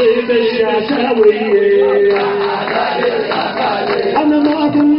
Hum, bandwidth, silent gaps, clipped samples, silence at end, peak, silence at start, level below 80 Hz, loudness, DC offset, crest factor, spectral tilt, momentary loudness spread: none; 5.6 kHz; none; under 0.1%; 0 s; 0 dBFS; 0 s; -52 dBFS; -13 LUFS; under 0.1%; 12 dB; -3 dB/octave; 5 LU